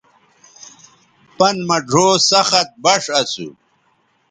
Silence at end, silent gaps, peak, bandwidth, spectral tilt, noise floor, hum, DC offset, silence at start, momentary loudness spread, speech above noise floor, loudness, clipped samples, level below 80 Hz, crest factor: 0.8 s; none; 0 dBFS; 10.5 kHz; -2.5 dB/octave; -61 dBFS; none; under 0.1%; 1.4 s; 10 LU; 45 dB; -14 LUFS; under 0.1%; -62 dBFS; 18 dB